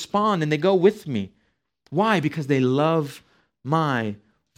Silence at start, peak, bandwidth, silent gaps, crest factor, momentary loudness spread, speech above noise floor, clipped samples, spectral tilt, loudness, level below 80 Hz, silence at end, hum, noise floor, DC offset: 0 s; -4 dBFS; 15.5 kHz; none; 18 dB; 13 LU; 44 dB; under 0.1%; -7 dB/octave; -22 LUFS; -66 dBFS; 0.45 s; none; -65 dBFS; under 0.1%